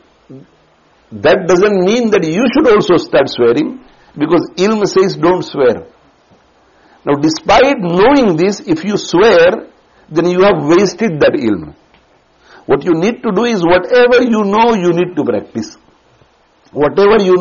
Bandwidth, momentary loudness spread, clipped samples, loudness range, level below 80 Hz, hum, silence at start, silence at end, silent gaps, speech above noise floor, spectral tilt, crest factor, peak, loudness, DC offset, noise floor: 7.4 kHz; 9 LU; under 0.1%; 3 LU; -44 dBFS; none; 0.3 s; 0 s; none; 40 dB; -4.5 dB/octave; 12 dB; 0 dBFS; -11 LUFS; under 0.1%; -50 dBFS